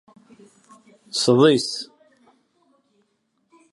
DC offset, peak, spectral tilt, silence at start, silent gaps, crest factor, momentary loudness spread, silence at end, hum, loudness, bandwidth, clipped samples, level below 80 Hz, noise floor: under 0.1%; -4 dBFS; -4.5 dB/octave; 1.15 s; none; 20 dB; 17 LU; 1.9 s; none; -19 LUFS; 11.5 kHz; under 0.1%; -70 dBFS; -70 dBFS